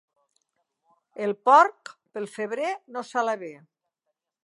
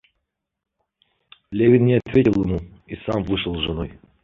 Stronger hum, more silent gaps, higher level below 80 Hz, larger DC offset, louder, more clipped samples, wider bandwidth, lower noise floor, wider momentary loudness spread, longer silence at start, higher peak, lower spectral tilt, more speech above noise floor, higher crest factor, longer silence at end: neither; neither; second, -88 dBFS vs -42 dBFS; neither; second, -24 LUFS vs -20 LUFS; neither; first, 11.5 kHz vs 6.8 kHz; first, -82 dBFS vs -77 dBFS; first, 20 LU vs 16 LU; second, 1.2 s vs 1.5 s; about the same, -4 dBFS vs -4 dBFS; second, -4 dB/octave vs -9 dB/octave; about the same, 58 dB vs 58 dB; about the same, 22 dB vs 18 dB; first, 0.9 s vs 0.3 s